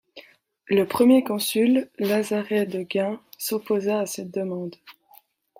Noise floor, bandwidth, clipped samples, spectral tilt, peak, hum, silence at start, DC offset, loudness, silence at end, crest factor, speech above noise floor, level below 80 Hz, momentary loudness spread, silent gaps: -56 dBFS; 16 kHz; under 0.1%; -5 dB/octave; -6 dBFS; none; 0.15 s; under 0.1%; -23 LUFS; 0.7 s; 18 dB; 34 dB; -68 dBFS; 12 LU; none